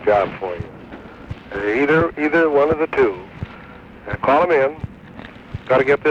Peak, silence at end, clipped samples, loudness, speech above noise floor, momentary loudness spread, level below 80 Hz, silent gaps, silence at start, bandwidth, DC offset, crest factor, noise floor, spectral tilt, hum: -4 dBFS; 0 s; under 0.1%; -18 LUFS; 22 dB; 22 LU; -44 dBFS; none; 0 s; 7.6 kHz; under 0.1%; 14 dB; -39 dBFS; -7.5 dB/octave; none